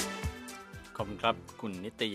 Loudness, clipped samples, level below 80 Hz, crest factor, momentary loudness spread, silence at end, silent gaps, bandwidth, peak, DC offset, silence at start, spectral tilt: -37 LUFS; under 0.1%; -50 dBFS; 24 dB; 13 LU; 0 s; none; 15.5 kHz; -12 dBFS; under 0.1%; 0 s; -4 dB/octave